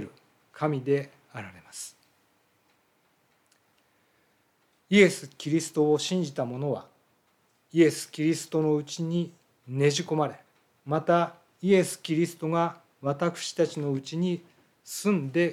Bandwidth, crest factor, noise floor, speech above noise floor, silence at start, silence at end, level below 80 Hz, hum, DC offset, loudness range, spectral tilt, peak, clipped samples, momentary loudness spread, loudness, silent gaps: 15.5 kHz; 22 dB; -69 dBFS; 42 dB; 0 s; 0 s; -80 dBFS; none; under 0.1%; 8 LU; -5.5 dB/octave; -6 dBFS; under 0.1%; 15 LU; -27 LUFS; none